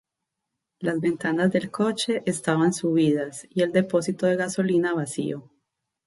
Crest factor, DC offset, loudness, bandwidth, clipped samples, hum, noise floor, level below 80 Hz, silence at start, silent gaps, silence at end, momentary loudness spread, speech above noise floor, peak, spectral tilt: 16 dB; under 0.1%; -24 LUFS; 11.5 kHz; under 0.1%; none; -83 dBFS; -68 dBFS; 0.8 s; none; 0.65 s; 7 LU; 60 dB; -8 dBFS; -5.5 dB/octave